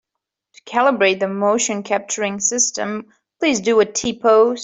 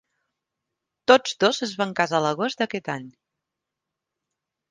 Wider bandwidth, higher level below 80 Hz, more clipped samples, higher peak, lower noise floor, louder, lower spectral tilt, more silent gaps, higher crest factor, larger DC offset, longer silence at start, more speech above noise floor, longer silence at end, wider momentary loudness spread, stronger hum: second, 8.4 kHz vs 9.8 kHz; first, -60 dBFS vs -72 dBFS; neither; about the same, -2 dBFS vs -2 dBFS; about the same, -82 dBFS vs -85 dBFS; first, -18 LUFS vs -23 LUFS; second, -2.5 dB/octave vs -4 dB/octave; neither; second, 16 dB vs 24 dB; neither; second, 0.65 s vs 1.1 s; about the same, 64 dB vs 63 dB; second, 0 s vs 1.6 s; second, 8 LU vs 12 LU; neither